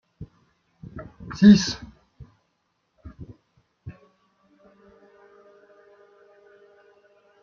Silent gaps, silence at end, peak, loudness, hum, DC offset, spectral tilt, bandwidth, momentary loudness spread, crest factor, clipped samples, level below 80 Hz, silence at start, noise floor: none; 3.55 s; -2 dBFS; -18 LUFS; none; under 0.1%; -6 dB/octave; 7 kHz; 31 LU; 24 dB; under 0.1%; -52 dBFS; 0.2 s; -73 dBFS